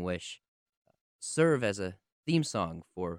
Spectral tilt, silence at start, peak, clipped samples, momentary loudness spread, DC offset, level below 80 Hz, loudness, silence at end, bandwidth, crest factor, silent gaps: -5 dB/octave; 0 s; -14 dBFS; under 0.1%; 16 LU; under 0.1%; -64 dBFS; -31 LUFS; 0 s; 11.5 kHz; 20 dB; 0.48-0.66 s, 0.77-0.85 s, 1.01-1.19 s, 2.12-2.23 s